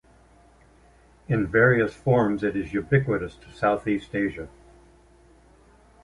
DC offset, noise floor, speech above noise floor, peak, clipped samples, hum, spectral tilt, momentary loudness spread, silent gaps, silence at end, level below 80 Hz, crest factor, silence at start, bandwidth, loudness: under 0.1%; -55 dBFS; 32 dB; -6 dBFS; under 0.1%; none; -8.5 dB/octave; 10 LU; none; 1.55 s; -50 dBFS; 20 dB; 1.3 s; 11 kHz; -24 LUFS